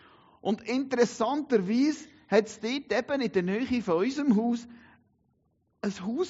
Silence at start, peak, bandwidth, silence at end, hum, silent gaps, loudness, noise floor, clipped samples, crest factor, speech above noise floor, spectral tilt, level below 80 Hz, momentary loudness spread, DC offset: 0.45 s; -10 dBFS; 8 kHz; 0 s; none; none; -28 LUFS; -72 dBFS; under 0.1%; 18 dB; 45 dB; -5 dB/octave; -66 dBFS; 8 LU; under 0.1%